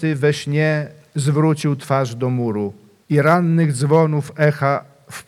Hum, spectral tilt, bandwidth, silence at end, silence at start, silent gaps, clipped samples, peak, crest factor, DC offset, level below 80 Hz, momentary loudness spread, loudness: none; -7 dB/octave; 13 kHz; 0.05 s; 0 s; none; under 0.1%; -2 dBFS; 16 dB; under 0.1%; -64 dBFS; 9 LU; -18 LUFS